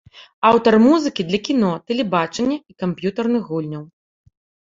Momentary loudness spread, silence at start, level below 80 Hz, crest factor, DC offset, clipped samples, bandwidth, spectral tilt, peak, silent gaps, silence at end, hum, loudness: 13 LU; 0.15 s; -58 dBFS; 18 dB; under 0.1%; under 0.1%; 7.8 kHz; -6 dB/octave; 0 dBFS; 0.33-0.42 s; 0.85 s; none; -18 LUFS